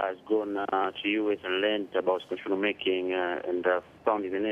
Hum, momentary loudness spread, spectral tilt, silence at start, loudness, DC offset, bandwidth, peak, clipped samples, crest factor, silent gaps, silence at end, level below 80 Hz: none; 2 LU; -6 dB/octave; 0 s; -29 LUFS; under 0.1%; 6.2 kHz; -14 dBFS; under 0.1%; 16 dB; none; 0 s; -70 dBFS